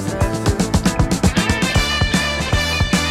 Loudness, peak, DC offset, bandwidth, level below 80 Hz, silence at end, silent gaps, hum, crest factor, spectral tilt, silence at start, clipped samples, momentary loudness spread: -17 LUFS; -2 dBFS; under 0.1%; 16 kHz; -26 dBFS; 0 s; none; none; 16 dB; -4.5 dB/octave; 0 s; under 0.1%; 2 LU